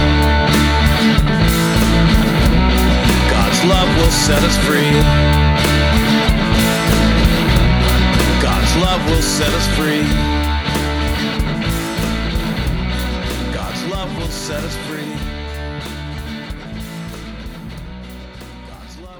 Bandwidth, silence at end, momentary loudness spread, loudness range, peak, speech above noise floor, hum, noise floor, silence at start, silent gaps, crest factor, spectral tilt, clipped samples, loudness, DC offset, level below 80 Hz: over 20 kHz; 0 s; 16 LU; 13 LU; 0 dBFS; 21 dB; none; -35 dBFS; 0 s; none; 14 dB; -5 dB/octave; under 0.1%; -15 LUFS; under 0.1%; -20 dBFS